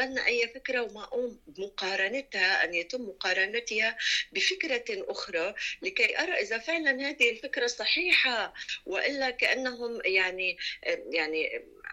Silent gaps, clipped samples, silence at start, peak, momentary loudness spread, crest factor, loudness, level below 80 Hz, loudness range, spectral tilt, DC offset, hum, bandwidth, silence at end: none; under 0.1%; 0 s; -12 dBFS; 9 LU; 18 dB; -28 LUFS; -66 dBFS; 3 LU; -1 dB/octave; under 0.1%; none; 13 kHz; 0 s